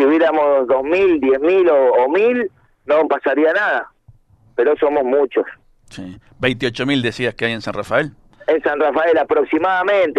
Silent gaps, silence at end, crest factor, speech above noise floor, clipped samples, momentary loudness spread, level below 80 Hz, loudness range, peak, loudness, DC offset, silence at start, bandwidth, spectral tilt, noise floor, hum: none; 0 s; 16 dB; 34 dB; under 0.1%; 13 LU; -52 dBFS; 5 LU; 0 dBFS; -16 LUFS; under 0.1%; 0 s; 10.5 kHz; -6 dB/octave; -50 dBFS; none